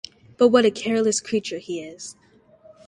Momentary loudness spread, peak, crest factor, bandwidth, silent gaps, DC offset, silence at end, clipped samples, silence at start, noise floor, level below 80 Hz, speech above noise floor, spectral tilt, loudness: 21 LU; -4 dBFS; 20 dB; 11.5 kHz; none; under 0.1%; 0.75 s; under 0.1%; 0.4 s; -52 dBFS; -64 dBFS; 31 dB; -3.5 dB/octave; -21 LUFS